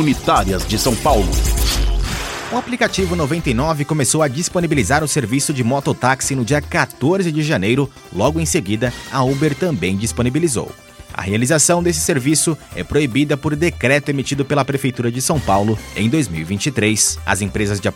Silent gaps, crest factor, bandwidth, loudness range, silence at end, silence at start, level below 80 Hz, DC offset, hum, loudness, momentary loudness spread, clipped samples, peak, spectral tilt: none; 18 dB; 16.5 kHz; 1 LU; 0 s; 0 s; -28 dBFS; under 0.1%; none; -17 LUFS; 6 LU; under 0.1%; 0 dBFS; -4.5 dB/octave